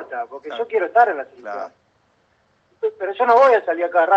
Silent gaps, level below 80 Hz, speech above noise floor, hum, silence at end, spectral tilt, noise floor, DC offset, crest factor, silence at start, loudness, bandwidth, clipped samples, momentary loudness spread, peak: none; -76 dBFS; 44 dB; none; 0 s; -4 dB/octave; -62 dBFS; under 0.1%; 18 dB; 0 s; -18 LUFS; 7.6 kHz; under 0.1%; 17 LU; -2 dBFS